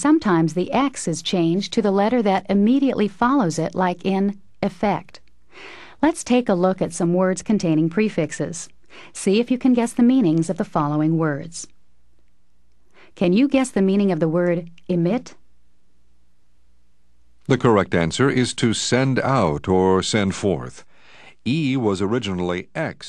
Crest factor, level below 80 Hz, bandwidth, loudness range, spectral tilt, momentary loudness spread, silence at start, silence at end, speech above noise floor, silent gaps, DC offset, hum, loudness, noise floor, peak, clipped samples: 18 dB; -50 dBFS; 12 kHz; 4 LU; -6 dB/octave; 10 LU; 0 s; 0 s; 45 dB; none; 0.5%; none; -20 LUFS; -64 dBFS; -2 dBFS; under 0.1%